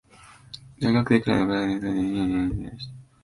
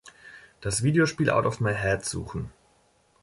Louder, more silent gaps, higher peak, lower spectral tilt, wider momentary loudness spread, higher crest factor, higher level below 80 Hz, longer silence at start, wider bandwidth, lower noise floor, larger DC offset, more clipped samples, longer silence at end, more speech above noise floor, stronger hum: about the same, -24 LUFS vs -26 LUFS; neither; first, -6 dBFS vs -10 dBFS; first, -7.5 dB/octave vs -5 dB/octave; first, 20 LU vs 14 LU; about the same, 20 dB vs 18 dB; about the same, -46 dBFS vs -48 dBFS; first, 0.25 s vs 0.05 s; about the same, 11.5 kHz vs 11.5 kHz; second, -51 dBFS vs -64 dBFS; neither; neither; second, 0.2 s vs 0.7 s; second, 27 dB vs 39 dB; neither